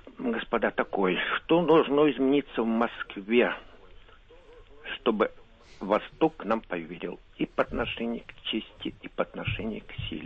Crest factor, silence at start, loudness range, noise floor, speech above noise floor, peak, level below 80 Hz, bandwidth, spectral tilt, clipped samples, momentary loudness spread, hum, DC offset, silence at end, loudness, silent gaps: 18 dB; 0.05 s; 7 LU; -53 dBFS; 25 dB; -10 dBFS; -52 dBFS; 6.4 kHz; -7.5 dB/octave; under 0.1%; 14 LU; none; under 0.1%; 0 s; -28 LUFS; none